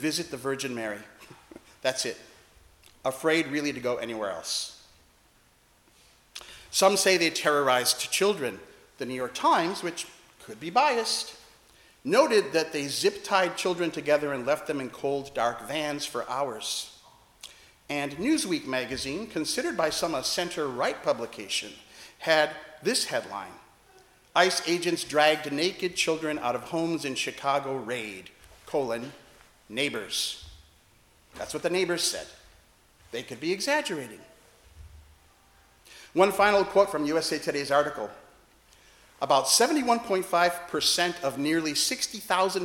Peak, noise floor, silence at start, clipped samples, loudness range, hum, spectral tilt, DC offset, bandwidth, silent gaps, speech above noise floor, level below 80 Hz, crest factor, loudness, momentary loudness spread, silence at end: -6 dBFS; -62 dBFS; 0 s; under 0.1%; 7 LU; none; -2.5 dB/octave; under 0.1%; 18 kHz; none; 35 dB; -64 dBFS; 22 dB; -27 LUFS; 15 LU; 0 s